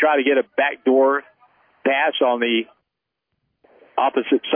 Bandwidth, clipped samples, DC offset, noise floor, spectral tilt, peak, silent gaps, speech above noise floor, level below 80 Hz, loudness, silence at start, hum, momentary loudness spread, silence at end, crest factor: 3.6 kHz; under 0.1%; under 0.1%; -81 dBFS; -7 dB/octave; -6 dBFS; none; 62 dB; -80 dBFS; -19 LUFS; 0 s; none; 9 LU; 0 s; 14 dB